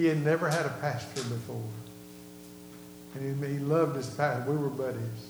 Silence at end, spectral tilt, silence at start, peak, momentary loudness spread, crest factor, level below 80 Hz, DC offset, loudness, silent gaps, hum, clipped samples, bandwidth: 0 s; -6.5 dB/octave; 0 s; -14 dBFS; 20 LU; 18 dB; -68 dBFS; under 0.1%; -31 LUFS; none; 60 Hz at -50 dBFS; under 0.1%; over 20 kHz